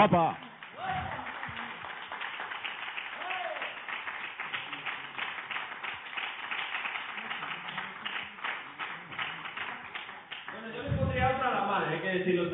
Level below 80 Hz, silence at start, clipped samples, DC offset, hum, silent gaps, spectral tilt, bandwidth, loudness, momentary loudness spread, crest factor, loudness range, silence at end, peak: -56 dBFS; 0 s; under 0.1%; under 0.1%; none; none; -3 dB/octave; 4.2 kHz; -34 LUFS; 11 LU; 24 dB; 5 LU; 0 s; -10 dBFS